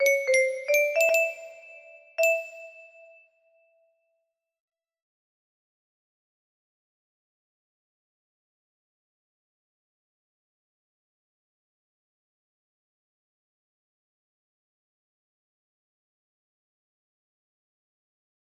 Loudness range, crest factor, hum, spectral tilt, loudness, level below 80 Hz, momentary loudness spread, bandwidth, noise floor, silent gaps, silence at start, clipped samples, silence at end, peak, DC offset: 7 LU; 22 dB; none; 1.5 dB/octave; -23 LUFS; -86 dBFS; 24 LU; 14.5 kHz; -80 dBFS; none; 0 s; under 0.1%; 15.65 s; -10 dBFS; under 0.1%